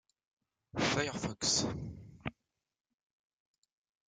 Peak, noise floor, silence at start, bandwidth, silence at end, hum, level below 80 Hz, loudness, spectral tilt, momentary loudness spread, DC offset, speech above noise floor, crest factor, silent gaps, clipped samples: -18 dBFS; -83 dBFS; 0.75 s; 11 kHz; 1.75 s; none; -62 dBFS; -34 LUFS; -3 dB/octave; 15 LU; under 0.1%; 49 dB; 22 dB; none; under 0.1%